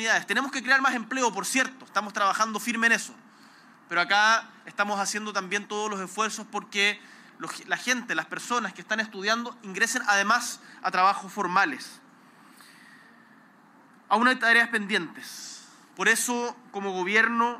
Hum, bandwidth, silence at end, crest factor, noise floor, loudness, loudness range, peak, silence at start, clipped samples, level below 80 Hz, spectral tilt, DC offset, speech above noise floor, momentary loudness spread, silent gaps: none; 15.5 kHz; 0 s; 18 dB; -56 dBFS; -25 LUFS; 4 LU; -10 dBFS; 0 s; under 0.1%; -86 dBFS; -2 dB/octave; under 0.1%; 29 dB; 14 LU; none